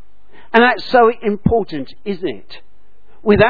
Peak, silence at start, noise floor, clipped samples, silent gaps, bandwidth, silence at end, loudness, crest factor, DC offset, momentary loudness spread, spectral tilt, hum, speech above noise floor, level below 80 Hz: 0 dBFS; 0.55 s; -55 dBFS; under 0.1%; none; 5.4 kHz; 0 s; -16 LUFS; 16 dB; 4%; 14 LU; -8 dB/octave; none; 40 dB; -40 dBFS